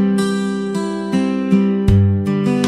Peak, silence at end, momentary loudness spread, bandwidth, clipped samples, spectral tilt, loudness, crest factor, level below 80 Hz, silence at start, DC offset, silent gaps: 0 dBFS; 0 s; 7 LU; 12 kHz; under 0.1%; -7.5 dB/octave; -17 LUFS; 14 dB; -34 dBFS; 0 s; under 0.1%; none